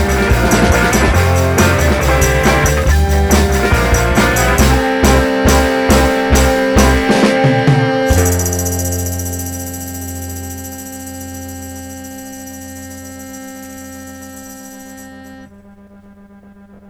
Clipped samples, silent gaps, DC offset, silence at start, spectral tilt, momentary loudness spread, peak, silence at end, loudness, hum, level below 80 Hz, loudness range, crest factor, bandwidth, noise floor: under 0.1%; none; under 0.1%; 0 s; -5 dB/octave; 19 LU; -2 dBFS; 1.45 s; -12 LUFS; none; -20 dBFS; 19 LU; 12 dB; over 20 kHz; -40 dBFS